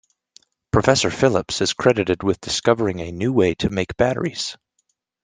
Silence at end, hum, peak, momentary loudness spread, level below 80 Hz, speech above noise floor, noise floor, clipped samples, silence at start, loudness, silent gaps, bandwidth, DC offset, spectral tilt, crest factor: 0.7 s; none; 0 dBFS; 7 LU; -46 dBFS; 52 dB; -71 dBFS; under 0.1%; 0.75 s; -20 LUFS; none; 10 kHz; under 0.1%; -4.5 dB/octave; 20 dB